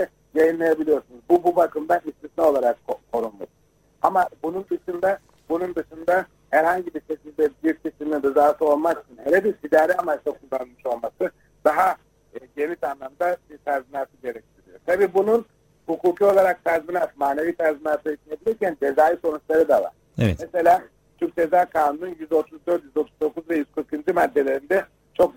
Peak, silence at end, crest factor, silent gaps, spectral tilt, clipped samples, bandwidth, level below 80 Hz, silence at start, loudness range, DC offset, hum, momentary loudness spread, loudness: -2 dBFS; 0.05 s; 20 dB; none; -7 dB/octave; under 0.1%; 16.5 kHz; -56 dBFS; 0 s; 4 LU; under 0.1%; none; 12 LU; -22 LUFS